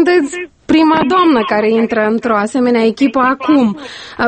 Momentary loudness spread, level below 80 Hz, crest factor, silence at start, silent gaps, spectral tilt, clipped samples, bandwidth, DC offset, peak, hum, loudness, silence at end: 7 LU; -48 dBFS; 12 dB; 0 s; none; -5.5 dB/octave; under 0.1%; 8.8 kHz; under 0.1%; 0 dBFS; none; -12 LUFS; 0 s